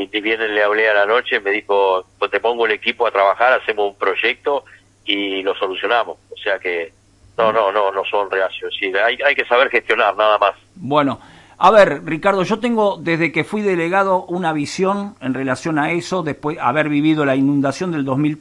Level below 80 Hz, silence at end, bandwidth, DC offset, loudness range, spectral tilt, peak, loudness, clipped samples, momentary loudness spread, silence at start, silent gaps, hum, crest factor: -56 dBFS; 0 s; 11.5 kHz; under 0.1%; 4 LU; -5.5 dB/octave; 0 dBFS; -17 LUFS; under 0.1%; 8 LU; 0 s; none; none; 18 dB